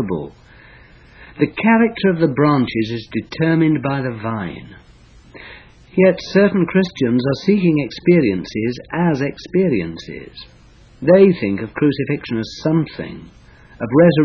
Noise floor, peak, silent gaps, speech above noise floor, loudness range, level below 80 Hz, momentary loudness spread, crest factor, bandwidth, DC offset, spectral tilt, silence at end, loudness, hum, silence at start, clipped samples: -45 dBFS; 0 dBFS; none; 29 dB; 3 LU; -48 dBFS; 17 LU; 16 dB; 6.8 kHz; under 0.1%; -8 dB/octave; 0 s; -17 LUFS; none; 0 s; under 0.1%